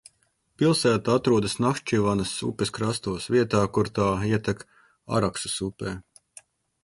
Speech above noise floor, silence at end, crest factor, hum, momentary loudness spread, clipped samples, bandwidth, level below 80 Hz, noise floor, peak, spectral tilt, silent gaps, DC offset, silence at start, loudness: 44 dB; 0.8 s; 18 dB; none; 9 LU; under 0.1%; 11.5 kHz; -52 dBFS; -69 dBFS; -8 dBFS; -5.5 dB/octave; none; under 0.1%; 0.6 s; -25 LUFS